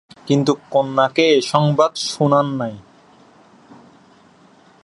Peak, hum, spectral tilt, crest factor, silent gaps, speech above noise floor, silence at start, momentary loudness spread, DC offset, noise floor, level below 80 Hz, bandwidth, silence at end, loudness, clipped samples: 0 dBFS; none; -5.5 dB/octave; 18 dB; none; 33 dB; 0.25 s; 6 LU; under 0.1%; -50 dBFS; -66 dBFS; 11.5 kHz; 2.05 s; -17 LUFS; under 0.1%